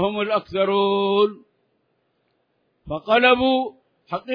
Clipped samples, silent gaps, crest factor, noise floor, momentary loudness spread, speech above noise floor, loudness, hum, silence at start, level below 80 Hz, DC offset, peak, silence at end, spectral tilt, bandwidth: under 0.1%; none; 18 dB; -69 dBFS; 16 LU; 50 dB; -20 LUFS; none; 0 s; -56 dBFS; under 0.1%; -4 dBFS; 0 s; -7.5 dB/octave; 5.2 kHz